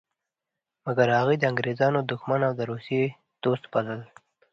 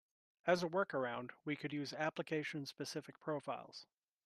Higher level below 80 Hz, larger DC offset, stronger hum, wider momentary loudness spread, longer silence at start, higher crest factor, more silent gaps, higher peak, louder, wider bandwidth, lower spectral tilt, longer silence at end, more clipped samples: first, -68 dBFS vs -86 dBFS; neither; neither; about the same, 10 LU vs 10 LU; first, 0.85 s vs 0.45 s; about the same, 20 dB vs 24 dB; neither; first, -6 dBFS vs -20 dBFS; first, -26 LUFS vs -42 LUFS; second, 7.6 kHz vs 13 kHz; first, -7.5 dB/octave vs -5 dB/octave; about the same, 0.5 s vs 0.4 s; neither